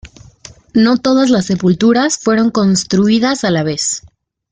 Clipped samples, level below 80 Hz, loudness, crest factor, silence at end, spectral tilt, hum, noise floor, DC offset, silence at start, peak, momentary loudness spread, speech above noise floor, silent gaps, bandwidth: under 0.1%; -48 dBFS; -13 LUFS; 12 dB; 0.55 s; -4.5 dB/octave; none; -39 dBFS; under 0.1%; 0.05 s; -2 dBFS; 5 LU; 27 dB; none; 9.6 kHz